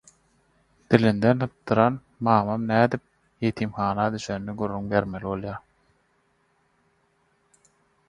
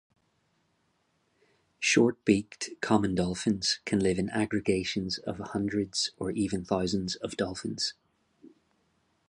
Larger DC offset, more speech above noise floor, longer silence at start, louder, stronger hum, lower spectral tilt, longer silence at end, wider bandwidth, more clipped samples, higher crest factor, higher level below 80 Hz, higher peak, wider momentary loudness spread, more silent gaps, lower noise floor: neither; about the same, 44 dB vs 44 dB; second, 0.9 s vs 1.8 s; first, -24 LUFS vs -29 LUFS; neither; first, -7.5 dB/octave vs -4.5 dB/octave; first, 2.5 s vs 0.8 s; about the same, 10.5 kHz vs 11.5 kHz; neither; about the same, 26 dB vs 22 dB; about the same, -56 dBFS vs -56 dBFS; first, 0 dBFS vs -8 dBFS; about the same, 10 LU vs 8 LU; neither; second, -67 dBFS vs -73 dBFS